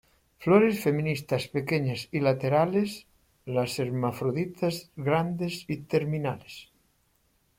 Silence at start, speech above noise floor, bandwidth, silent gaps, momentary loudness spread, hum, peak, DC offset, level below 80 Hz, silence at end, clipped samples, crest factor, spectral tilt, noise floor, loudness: 0.4 s; 42 dB; 16.5 kHz; none; 11 LU; none; -6 dBFS; under 0.1%; -62 dBFS; 0.95 s; under 0.1%; 22 dB; -6.5 dB/octave; -69 dBFS; -28 LUFS